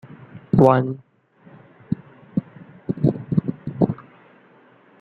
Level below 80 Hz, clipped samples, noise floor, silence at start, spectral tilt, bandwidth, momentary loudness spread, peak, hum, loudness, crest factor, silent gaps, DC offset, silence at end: -50 dBFS; under 0.1%; -53 dBFS; 0.35 s; -10.5 dB/octave; 6 kHz; 21 LU; -2 dBFS; none; -22 LUFS; 22 dB; none; under 0.1%; 1.05 s